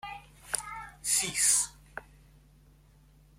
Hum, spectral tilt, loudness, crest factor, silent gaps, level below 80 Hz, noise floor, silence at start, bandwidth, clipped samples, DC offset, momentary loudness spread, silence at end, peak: none; 0.5 dB/octave; -27 LUFS; 26 dB; none; -60 dBFS; -59 dBFS; 0.05 s; 16.5 kHz; under 0.1%; under 0.1%; 23 LU; 1.35 s; -8 dBFS